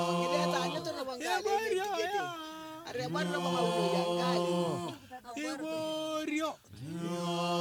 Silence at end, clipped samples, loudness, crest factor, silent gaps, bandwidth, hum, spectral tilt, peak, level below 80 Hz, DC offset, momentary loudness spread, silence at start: 0 s; under 0.1%; -34 LUFS; 16 dB; none; 19 kHz; none; -4.5 dB/octave; -16 dBFS; -74 dBFS; under 0.1%; 12 LU; 0 s